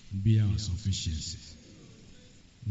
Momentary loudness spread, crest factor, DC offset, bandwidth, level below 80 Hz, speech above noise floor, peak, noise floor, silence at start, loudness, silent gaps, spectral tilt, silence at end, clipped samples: 24 LU; 18 dB; under 0.1%; 8 kHz; -46 dBFS; 26 dB; -14 dBFS; -54 dBFS; 0.05 s; -30 LUFS; none; -7 dB/octave; 0 s; under 0.1%